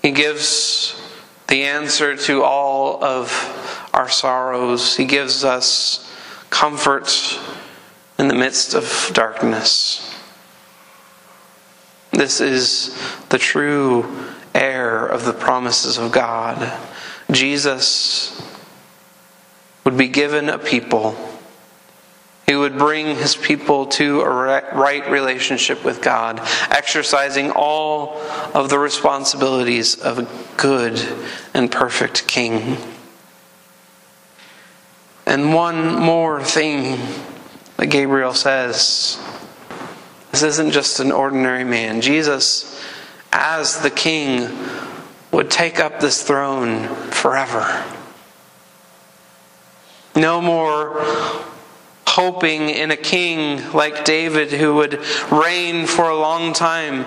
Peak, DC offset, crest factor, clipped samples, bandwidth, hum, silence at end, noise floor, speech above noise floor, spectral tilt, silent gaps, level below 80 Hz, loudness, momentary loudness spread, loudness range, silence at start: 0 dBFS; under 0.1%; 18 dB; under 0.1%; 15.5 kHz; none; 0 s; -49 dBFS; 31 dB; -2.5 dB/octave; none; -62 dBFS; -17 LUFS; 11 LU; 4 LU; 0.05 s